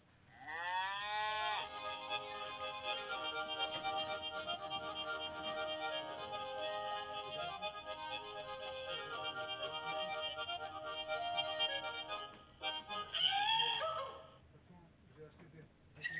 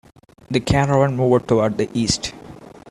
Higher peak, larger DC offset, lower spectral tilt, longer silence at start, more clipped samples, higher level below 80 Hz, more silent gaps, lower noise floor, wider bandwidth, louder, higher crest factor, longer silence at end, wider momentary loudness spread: second, -22 dBFS vs -2 dBFS; neither; second, 1 dB/octave vs -5.5 dB/octave; second, 0.3 s vs 0.5 s; neither; second, -72 dBFS vs -40 dBFS; neither; first, -62 dBFS vs -40 dBFS; second, 4 kHz vs 12.5 kHz; second, -40 LUFS vs -19 LUFS; about the same, 20 dB vs 18 dB; about the same, 0 s vs 0 s; about the same, 10 LU vs 8 LU